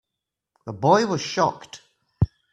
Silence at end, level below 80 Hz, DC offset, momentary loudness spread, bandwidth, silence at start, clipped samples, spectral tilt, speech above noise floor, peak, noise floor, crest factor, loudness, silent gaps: 0.25 s; -46 dBFS; under 0.1%; 22 LU; 11.5 kHz; 0.65 s; under 0.1%; -5.5 dB/octave; 63 dB; -2 dBFS; -85 dBFS; 22 dB; -22 LUFS; none